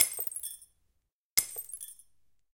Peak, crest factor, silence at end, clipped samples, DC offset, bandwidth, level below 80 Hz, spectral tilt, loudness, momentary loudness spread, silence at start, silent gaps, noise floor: 0 dBFS; 36 dB; 0.6 s; under 0.1%; under 0.1%; 17 kHz; -72 dBFS; 2 dB/octave; -32 LUFS; 16 LU; 0 s; 1.12-1.37 s; -79 dBFS